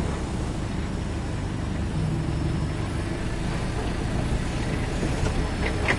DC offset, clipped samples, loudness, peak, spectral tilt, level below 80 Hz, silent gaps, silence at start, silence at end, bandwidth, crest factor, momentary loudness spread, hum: under 0.1%; under 0.1%; -28 LUFS; -10 dBFS; -6 dB/octave; -32 dBFS; none; 0 s; 0 s; 11.5 kHz; 16 dB; 3 LU; none